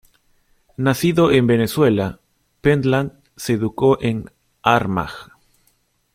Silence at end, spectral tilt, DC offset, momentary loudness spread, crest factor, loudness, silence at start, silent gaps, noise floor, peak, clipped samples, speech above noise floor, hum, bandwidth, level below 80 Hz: 0.9 s; -6.5 dB/octave; under 0.1%; 14 LU; 18 dB; -18 LUFS; 0.8 s; none; -63 dBFS; -2 dBFS; under 0.1%; 46 dB; none; 16.5 kHz; -48 dBFS